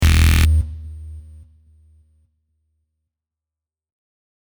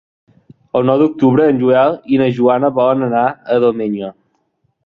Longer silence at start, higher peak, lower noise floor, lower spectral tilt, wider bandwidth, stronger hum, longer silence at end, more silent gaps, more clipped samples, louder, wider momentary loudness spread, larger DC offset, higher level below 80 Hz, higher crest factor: second, 0 s vs 0.75 s; about the same, -2 dBFS vs -2 dBFS; first, -88 dBFS vs -64 dBFS; second, -5 dB/octave vs -9.5 dB/octave; first, over 20 kHz vs 5.2 kHz; neither; first, 3.3 s vs 0.75 s; neither; neither; about the same, -16 LUFS vs -14 LUFS; first, 24 LU vs 9 LU; neither; first, -22 dBFS vs -56 dBFS; first, 20 dB vs 14 dB